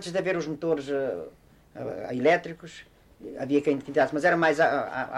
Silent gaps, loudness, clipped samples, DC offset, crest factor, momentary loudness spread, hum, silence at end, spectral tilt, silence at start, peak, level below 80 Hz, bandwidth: none; -26 LUFS; under 0.1%; under 0.1%; 16 dB; 20 LU; none; 0 s; -5.5 dB/octave; 0 s; -10 dBFS; -62 dBFS; 12.5 kHz